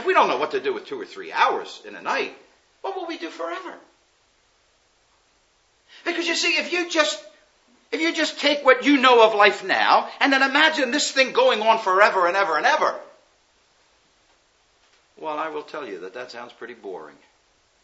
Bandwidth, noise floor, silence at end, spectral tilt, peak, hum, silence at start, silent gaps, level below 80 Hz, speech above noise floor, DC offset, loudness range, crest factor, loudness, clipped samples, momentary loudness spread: 8 kHz; -63 dBFS; 0.75 s; -1.5 dB/octave; 0 dBFS; none; 0 s; none; -78 dBFS; 42 dB; under 0.1%; 18 LU; 22 dB; -20 LUFS; under 0.1%; 19 LU